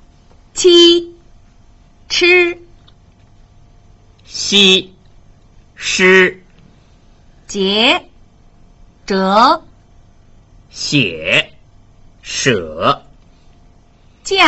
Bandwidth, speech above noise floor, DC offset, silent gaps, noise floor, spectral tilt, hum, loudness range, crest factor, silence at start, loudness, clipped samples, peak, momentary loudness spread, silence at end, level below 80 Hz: 8.2 kHz; 34 dB; under 0.1%; none; -47 dBFS; -3 dB/octave; none; 5 LU; 16 dB; 0.55 s; -12 LUFS; under 0.1%; 0 dBFS; 18 LU; 0 s; -46 dBFS